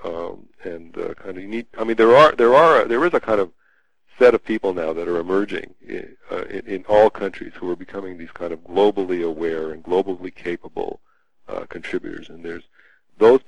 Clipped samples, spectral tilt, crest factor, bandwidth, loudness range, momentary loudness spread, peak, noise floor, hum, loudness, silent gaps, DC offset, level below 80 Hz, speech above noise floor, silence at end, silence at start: under 0.1%; -6 dB/octave; 18 dB; 10.5 kHz; 11 LU; 21 LU; -2 dBFS; -63 dBFS; none; -19 LUFS; none; 1%; -54 dBFS; 44 dB; 0.1 s; 0.05 s